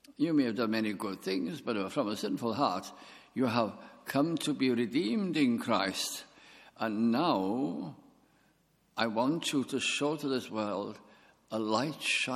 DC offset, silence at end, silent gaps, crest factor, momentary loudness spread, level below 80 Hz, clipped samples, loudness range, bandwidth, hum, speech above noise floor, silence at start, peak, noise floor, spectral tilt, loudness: under 0.1%; 0 s; none; 22 dB; 11 LU; -78 dBFS; under 0.1%; 3 LU; 15.5 kHz; none; 38 dB; 0.1 s; -12 dBFS; -70 dBFS; -4.5 dB/octave; -32 LUFS